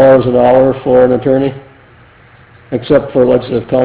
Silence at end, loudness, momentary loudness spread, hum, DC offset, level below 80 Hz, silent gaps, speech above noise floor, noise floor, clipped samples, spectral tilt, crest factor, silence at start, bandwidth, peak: 0 s; -11 LUFS; 9 LU; none; under 0.1%; -40 dBFS; none; 32 dB; -41 dBFS; 0.5%; -11.5 dB/octave; 10 dB; 0 s; 4 kHz; 0 dBFS